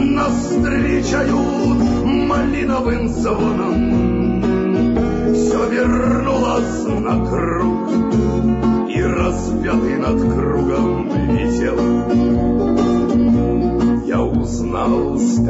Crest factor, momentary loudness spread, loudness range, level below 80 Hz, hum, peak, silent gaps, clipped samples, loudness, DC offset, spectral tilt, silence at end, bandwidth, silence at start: 10 dB; 3 LU; 1 LU; -28 dBFS; none; -6 dBFS; none; under 0.1%; -17 LUFS; under 0.1%; -7 dB/octave; 0 s; 8 kHz; 0 s